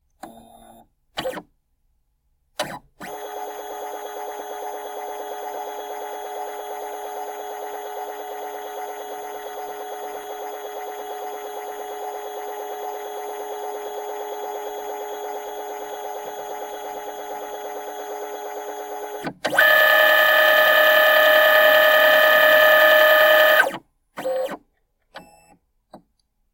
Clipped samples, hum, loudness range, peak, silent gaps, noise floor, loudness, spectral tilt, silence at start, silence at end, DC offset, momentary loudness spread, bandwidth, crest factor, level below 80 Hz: under 0.1%; none; 19 LU; -2 dBFS; none; -68 dBFS; -15 LUFS; -1 dB/octave; 0.25 s; 0.55 s; under 0.1%; 19 LU; 17.5 kHz; 20 dB; -64 dBFS